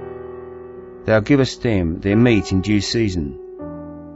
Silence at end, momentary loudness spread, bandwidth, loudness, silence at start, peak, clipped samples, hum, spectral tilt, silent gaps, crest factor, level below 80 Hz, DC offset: 0 s; 19 LU; 8 kHz; -18 LUFS; 0 s; -2 dBFS; under 0.1%; none; -6.5 dB/octave; none; 18 dB; -38 dBFS; under 0.1%